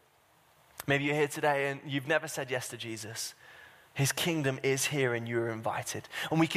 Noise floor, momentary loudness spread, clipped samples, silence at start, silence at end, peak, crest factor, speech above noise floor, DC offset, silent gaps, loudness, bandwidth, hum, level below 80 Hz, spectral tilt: -65 dBFS; 11 LU; under 0.1%; 0.8 s; 0 s; -14 dBFS; 20 dB; 34 dB; under 0.1%; none; -32 LUFS; 15.5 kHz; none; -70 dBFS; -4 dB/octave